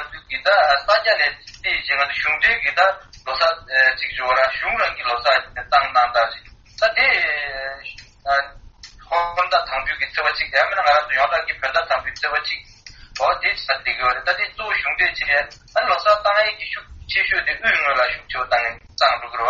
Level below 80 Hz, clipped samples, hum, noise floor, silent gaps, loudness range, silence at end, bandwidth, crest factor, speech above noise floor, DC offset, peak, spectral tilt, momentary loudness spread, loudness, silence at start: -48 dBFS; under 0.1%; none; -43 dBFS; none; 3 LU; 0 s; 7.4 kHz; 20 dB; 23 dB; under 0.1%; 0 dBFS; 2.5 dB/octave; 10 LU; -19 LUFS; 0 s